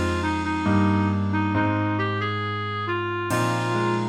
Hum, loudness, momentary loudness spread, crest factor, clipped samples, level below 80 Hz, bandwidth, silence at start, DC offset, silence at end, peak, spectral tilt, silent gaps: none; -24 LUFS; 5 LU; 14 dB; under 0.1%; -48 dBFS; 15.5 kHz; 0 s; under 0.1%; 0 s; -10 dBFS; -6.5 dB/octave; none